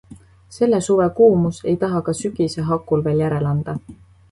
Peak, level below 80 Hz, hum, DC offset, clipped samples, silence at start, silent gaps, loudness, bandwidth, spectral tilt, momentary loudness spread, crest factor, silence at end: -2 dBFS; -48 dBFS; none; under 0.1%; under 0.1%; 0.1 s; none; -19 LUFS; 11.5 kHz; -7 dB/octave; 9 LU; 16 dB; 0.4 s